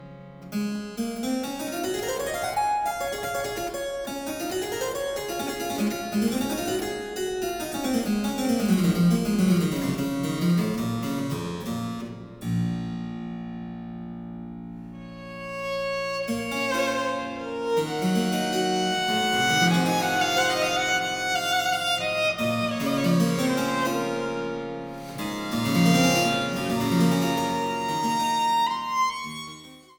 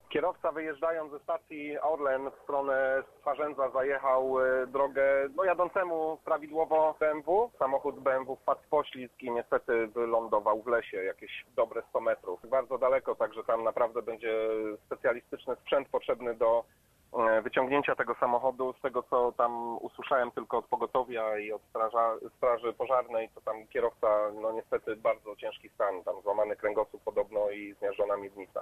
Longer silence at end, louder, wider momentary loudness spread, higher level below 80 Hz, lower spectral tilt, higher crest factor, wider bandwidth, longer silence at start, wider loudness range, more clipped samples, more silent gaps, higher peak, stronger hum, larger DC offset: first, 0.15 s vs 0 s; first, -25 LUFS vs -31 LUFS; first, 13 LU vs 8 LU; first, -54 dBFS vs -66 dBFS; second, -4.5 dB/octave vs -6 dB/octave; about the same, 18 dB vs 18 dB; first, over 20 kHz vs 13.5 kHz; about the same, 0 s vs 0.1 s; first, 9 LU vs 3 LU; neither; neither; first, -8 dBFS vs -12 dBFS; neither; neither